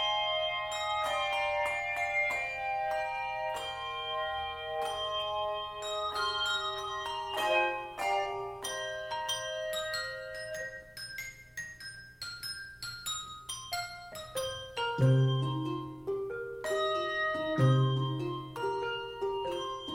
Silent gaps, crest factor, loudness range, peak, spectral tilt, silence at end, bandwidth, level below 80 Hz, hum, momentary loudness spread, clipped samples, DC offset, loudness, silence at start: none; 18 dB; 8 LU; -16 dBFS; -4.5 dB/octave; 0 s; 16.5 kHz; -60 dBFS; 60 Hz at -60 dBFS; 11 LU; under 0.1%; under 0.1%; -33 LUFS; 0 s